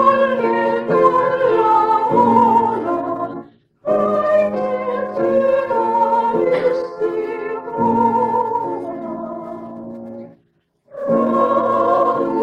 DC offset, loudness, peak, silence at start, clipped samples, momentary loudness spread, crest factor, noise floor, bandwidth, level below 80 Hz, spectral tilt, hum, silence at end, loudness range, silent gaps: under 0.1%; -17 LUFS; 0 dBFS; 0 s; under 0.1%; 14 LU; 16 dB; -62 dBFS; 8 kHz; -60 dBFS; -7.5 dB/octave; none; 0 s; 6 LU; none